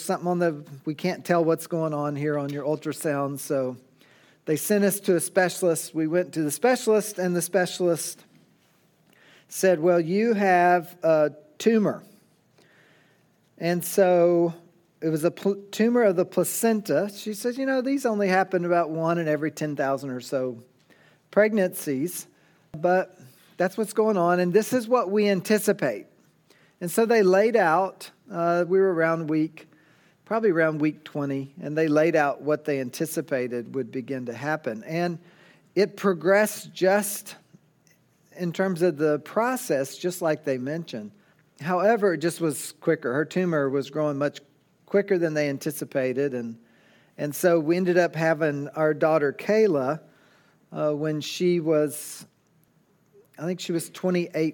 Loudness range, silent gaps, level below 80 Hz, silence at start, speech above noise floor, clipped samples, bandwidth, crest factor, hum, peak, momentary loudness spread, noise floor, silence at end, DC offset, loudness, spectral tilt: 4 LU; none; -78 dBFS; 0 s; 40 dB; under 0.1%; 18 kHz; 18 dB; none; -6 dBFS; 11 LU; -64 dBFS; 0 s; under 0.1%; -24 LUFS; -5.5 dB/octave